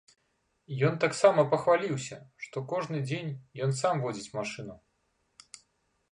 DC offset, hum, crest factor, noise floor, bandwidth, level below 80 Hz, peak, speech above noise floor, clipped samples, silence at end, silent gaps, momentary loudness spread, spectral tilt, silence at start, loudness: under 0.1%; none; 22 dB; -75 dBFS; 11 kHz; -72 dBFS; -8 dBFS; 46 dB; under 0.1%; 1.35 s; none; 18 LU; -5.5 dB/octave; 0.7 s; -29 LUFS